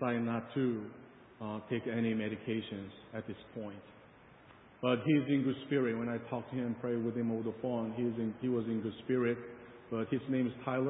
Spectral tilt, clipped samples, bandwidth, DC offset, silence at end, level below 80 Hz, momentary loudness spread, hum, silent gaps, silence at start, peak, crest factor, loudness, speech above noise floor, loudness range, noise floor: -5.5 dB/octave; under 0.1%; 3.9 kHz; under 0.1%; 0 s; -70 dBFS; 13 LU; none; none; 0 s; -18 dBFS; 18 dB; -36 LUFS; 24 dB; 5 LU; -59 dBFS